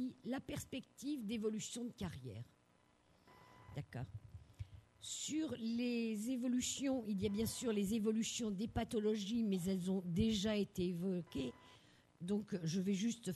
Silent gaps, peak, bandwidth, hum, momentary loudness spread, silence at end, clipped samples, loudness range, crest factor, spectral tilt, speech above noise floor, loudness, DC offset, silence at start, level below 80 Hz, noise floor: none; -24 dBFS; 13 kHz; none; 14 LU; 0 s; under 0.1%; 10 LU; 18 dB; -5 dB/octave; 33 dB; -41 LUFS; under 0.1%; 0 s; -64 dBFS; -73 dBFS